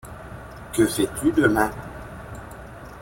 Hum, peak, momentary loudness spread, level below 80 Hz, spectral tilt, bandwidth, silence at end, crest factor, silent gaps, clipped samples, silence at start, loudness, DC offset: none; -4 dBFS; 20 LU; -44 dBFS; -5 dB/octave; 17 kHz; 0 s; 22 dB; none; under 0.1%; 0.05 s; -22 LUFS; under 0.1%